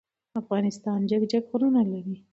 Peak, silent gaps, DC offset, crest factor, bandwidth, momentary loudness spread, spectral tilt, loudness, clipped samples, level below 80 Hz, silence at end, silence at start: -12 dBFS; none; under 0.1%; 14 dB; 8 kHz; 11 LU; -7.5 dB/octave; -26 LUFS; under 0.1%; -72 dBFS; 0.15 s; 0.35 s